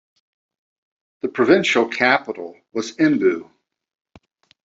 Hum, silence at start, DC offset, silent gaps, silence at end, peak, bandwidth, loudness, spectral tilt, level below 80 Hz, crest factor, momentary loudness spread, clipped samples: none; 1.25 s; under 0.1%; none; 1.2 s; -2 dBFS; 7.8 kHz; -19 LUFS; -4.5 dB/octave; -66 dBFS; 20 dB; 14 LU; under 0.1%